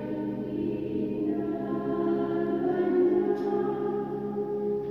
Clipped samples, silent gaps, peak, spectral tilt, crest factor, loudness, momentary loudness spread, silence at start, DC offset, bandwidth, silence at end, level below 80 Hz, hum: under 0.1%; none; -14 dBFS; -10 dB/octave; 14 dB; -29 LUFS; 7 LU; 0 s; under 0.1%; 5.6 kHz; 0 s; -62 dBFS; none